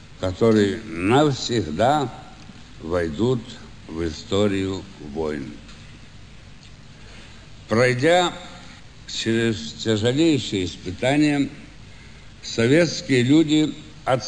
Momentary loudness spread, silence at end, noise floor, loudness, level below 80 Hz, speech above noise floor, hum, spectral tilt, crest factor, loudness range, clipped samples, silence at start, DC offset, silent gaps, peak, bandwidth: 20 LU; 0 s; -44 dBFS; -21 LUFS; -48 dBFS; 23 dB; none; -5.5 dB/octave; 18 dB; 7 LU; under 0.1%; 0 s; 0.4%; none; -6 dBFS; 11 kHz